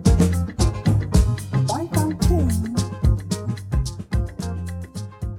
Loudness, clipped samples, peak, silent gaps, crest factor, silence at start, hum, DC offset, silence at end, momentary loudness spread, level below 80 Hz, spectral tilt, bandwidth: -22 LUFS; under 0.1%; -4 dBFS; none; 18 dB; 0 s; none; under 0.1%; 0 s; 10 LU; -26 dBFS; -6.5 dB/octave; 16.5 kHz